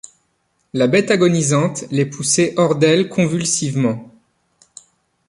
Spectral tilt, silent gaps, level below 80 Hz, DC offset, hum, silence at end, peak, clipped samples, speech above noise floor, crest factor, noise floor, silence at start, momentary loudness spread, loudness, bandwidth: -4.5 dB/octave; none; -58 dBFS; under 0.1%; none; 1.2 s; -2 dBFS; under 0.1%; 50 dB; 16 dB; -66 dBFS; 0.75 s; 7 LU; -16 LUFS; 11.5 kHz